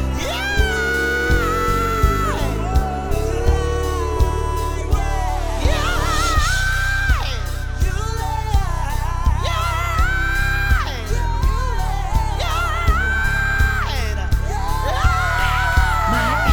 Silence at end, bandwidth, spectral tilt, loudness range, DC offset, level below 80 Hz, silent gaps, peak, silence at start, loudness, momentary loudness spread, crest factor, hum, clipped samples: 0 s; 20 kHz; -4.5 dB/octave; 2 LU; under 0.1%; -20 dBFS; none; -2 dBFS; 0 s; -20 LUFS; 5 LU; 16 dB; none; under 0.1%